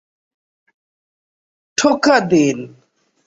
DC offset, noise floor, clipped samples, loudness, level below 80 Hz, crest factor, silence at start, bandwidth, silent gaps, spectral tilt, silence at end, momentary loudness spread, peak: under 0.1%; under -90 dBFS; under 0.1%; -15 LUFS; -60 dBFS; 18 dB; 1.8 s; 8 kHz; none; -4 dB/octave; 0.6 s; 15 LU; -2 dBFS